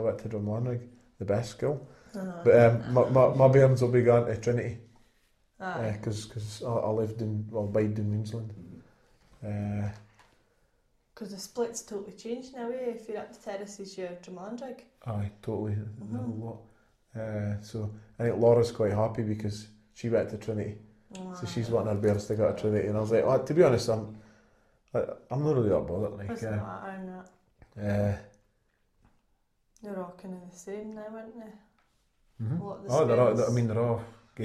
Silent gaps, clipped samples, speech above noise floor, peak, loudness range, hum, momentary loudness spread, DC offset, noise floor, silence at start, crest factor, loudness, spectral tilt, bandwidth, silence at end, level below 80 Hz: none; under 0.1%; 43 dB; -8 dBFS; 14 LU; none; 20 LU; under 0.1%; -72 dBFS; 0 s; 22 dB; -29 LUFS; -7.5 dB/octave; 13 kHz; 0 s; -60 dBFS